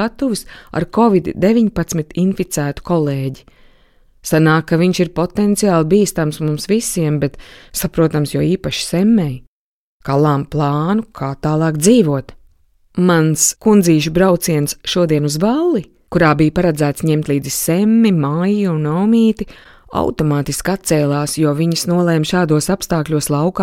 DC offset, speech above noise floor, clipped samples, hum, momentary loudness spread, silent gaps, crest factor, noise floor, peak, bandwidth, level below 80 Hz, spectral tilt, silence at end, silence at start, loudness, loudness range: under 0.1%; 37 dB; under 0.1%; none; 8 LU; 9.47-10.00 s; 14 dB; -52 dBFS; 0 dBFS; 16.5 kHz; -40 dBFS; -5.5 dB/octave; 0 s; 0 s; -15 LUFS; 3 LU